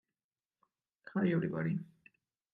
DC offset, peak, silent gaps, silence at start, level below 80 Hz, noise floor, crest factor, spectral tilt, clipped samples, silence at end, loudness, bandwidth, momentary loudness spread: under 0.1%; -20 dBFS; none; 1.05 s; -80 dBFS; under -90 dBFS; 18 dB; -10.5 dB/octave; under 0.1%; 0.7 s; -35 LUFS; 4.6 kHz; 9 LU